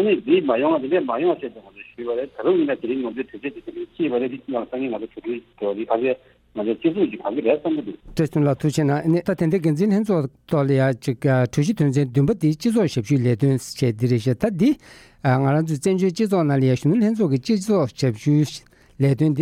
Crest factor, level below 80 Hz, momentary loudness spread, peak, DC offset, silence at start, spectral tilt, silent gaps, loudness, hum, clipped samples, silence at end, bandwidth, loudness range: 16 dB; -54 dBFS; 10 LU; -6 dBFS; under 0.1%; 0 s; -7.5 dB/octave; none; -21 LUFS; none; under 0.1%; 0 s; 14.5 kHz; 5 LU